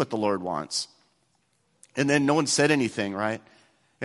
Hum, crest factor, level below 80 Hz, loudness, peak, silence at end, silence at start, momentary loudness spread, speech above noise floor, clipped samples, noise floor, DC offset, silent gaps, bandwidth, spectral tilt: none; 20 dB; -66 dBFS; -25 LUFS; -6 dBFS; 0 s; 0 s; 11 LU; 45 dB; under 0.1%; -70 dBFS; under 0.1%; none; 12 kHz; -4 dB/octave